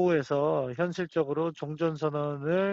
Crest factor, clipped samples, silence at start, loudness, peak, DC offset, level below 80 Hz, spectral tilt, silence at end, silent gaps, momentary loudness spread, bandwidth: 14 dB; under 0.1%; 0 s; -29 LUFS; -14 dBFS; under 0.1%; -68 dBFS; -6 dB/octave; 0 s; none; 5 LU; 7.8 kHz